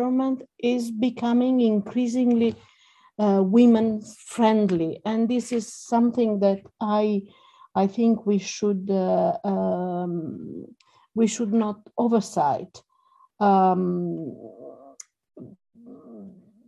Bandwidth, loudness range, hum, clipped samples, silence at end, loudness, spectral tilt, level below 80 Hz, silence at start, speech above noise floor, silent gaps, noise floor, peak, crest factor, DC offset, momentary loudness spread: 11.5 kHz; 5 LU; none; under 0.1%; 0.4 s; -23 LUFS; -6.5 dB/octave; -66 dBFS; 0 s; 38 dB; none; -60 dBFS; -6 dBFS; 18 dB; under 0.1%; 14 LU